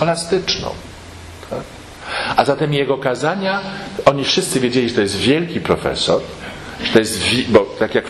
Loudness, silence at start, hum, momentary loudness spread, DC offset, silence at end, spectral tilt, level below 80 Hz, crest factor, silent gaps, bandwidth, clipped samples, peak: -17 LUFS; 0 s; none; 16 LU; under 0.1%; 0 s; -4.5 dB/octave; -44 dBFS; 18 dB; none; 13.5 kHz; under 0.1%; 0 dBFS